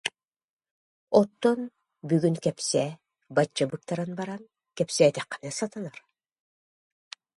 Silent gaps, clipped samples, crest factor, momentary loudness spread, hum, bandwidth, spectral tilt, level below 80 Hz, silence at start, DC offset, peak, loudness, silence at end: 0.27-0.31 s, 0.44-0.57 s, 0.71-1.07 s; under 0.1%; 24 dB; 18 LU; none; 11.5 kHz; -5 dB/octave; -72 dBFS; 0.05 s; under 0.1%; -6 dBFS; -27 LUFS; 1.45 s